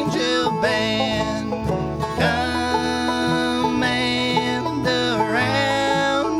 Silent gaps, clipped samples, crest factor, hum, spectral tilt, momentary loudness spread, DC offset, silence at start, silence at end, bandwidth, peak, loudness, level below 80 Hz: none; under 0.1%; 14 dB; none; -4.5 dB/octave; 5 LU; under 0.1%; 0 s; 0 s; 14.5 kHz; -6 dBFS; -20 LUFS; -42 dBFS